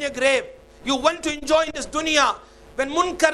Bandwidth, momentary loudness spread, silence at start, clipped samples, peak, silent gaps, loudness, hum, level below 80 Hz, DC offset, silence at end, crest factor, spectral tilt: 13.5 kHz; 14 LU; 0 s; under 0.1%; 0 dBFS; none; -21 LUFS; none; -48 dBFS; under 0.1%; 0 s; 22 dB; -1.5 dB/octave